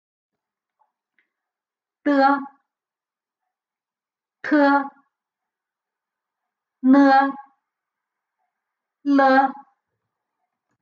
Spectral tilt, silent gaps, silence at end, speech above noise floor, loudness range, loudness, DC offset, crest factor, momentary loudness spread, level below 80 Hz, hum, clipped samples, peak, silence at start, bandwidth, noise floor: -5.5 dB/octave; none; 1.3 s; over 74 dB; 6 LU; -18 LUFS; under 0.1%; 20 dB; 16 LU; -88 dBFS; none; under 0.1%; -4 dBFS; 2.05 s; 6.6 kHz; under -90 dBFS